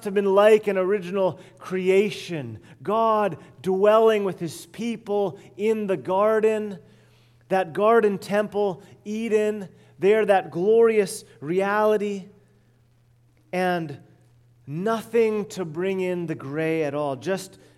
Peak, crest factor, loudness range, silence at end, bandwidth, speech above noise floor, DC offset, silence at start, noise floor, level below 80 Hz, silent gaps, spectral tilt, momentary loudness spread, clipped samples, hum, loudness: -4 dBFS; 18 dB; 5 LU; 0.3 s; 14 kHz; 37 dB; under 0.1%; 0 s; -59 dBFS; -70 dBFS; none; -6 dB/octave; 15 LU; under 0.1%; none; -23 LUFS